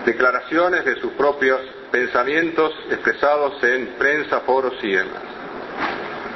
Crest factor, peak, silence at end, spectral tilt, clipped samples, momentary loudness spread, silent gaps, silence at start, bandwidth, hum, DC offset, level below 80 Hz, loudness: 18 dB; -2 dBFS; 0 s; -5 dB/octave; under 0.1%; 9 LU; none; 0 s; 6.2 kHz; none; under 0.1%; -56 dBFS; -20 LUFS